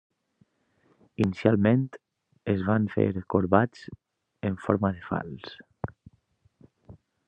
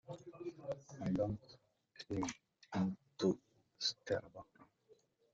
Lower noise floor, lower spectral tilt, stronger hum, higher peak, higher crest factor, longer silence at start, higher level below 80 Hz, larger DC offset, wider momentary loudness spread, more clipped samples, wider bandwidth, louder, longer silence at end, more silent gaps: about the same, -68 dBFS vs -71 dBFS; first, -9 dB/octave vs -5.5 dB/octave; neither; first, -4 dBFS vs -22 dBFS; about the same, 24 dB vs 20 dB; first, 1.2 s vs 0.1 s; first, -62 dBFS vs -70 dBFS; neither; first, 18 LU vs 15 LU; neither; about the same, 8.2 kHz vs 7.8 kHz; first, -26 LUFS vs -42 LUFS; second, 0.3 s vs 0.7 s; neither